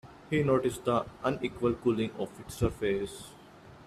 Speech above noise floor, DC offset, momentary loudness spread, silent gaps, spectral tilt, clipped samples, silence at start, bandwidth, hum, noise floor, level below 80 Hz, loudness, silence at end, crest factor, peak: 22 dB; under 0.1%; 12 LU; none; -6.5 dB/octave; under 0.1%; 0.05 s; 15 kHz; none; -52 dBFS; -52 dBFS; -31 LUFS; 0 s; 18 dB; -14 dBFS